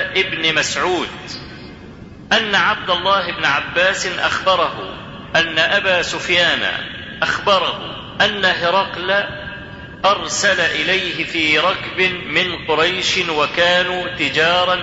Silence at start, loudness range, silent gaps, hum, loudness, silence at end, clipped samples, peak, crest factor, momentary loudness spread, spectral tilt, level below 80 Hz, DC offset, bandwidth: 0 s; 2 LU; none; none; -16 LUFS; 0 s; under 0.1%; -2 dBFS; 16 dB; 14 LU; -2.5 dB/octave; -46 dBFS; under 0.1%; 8 kHz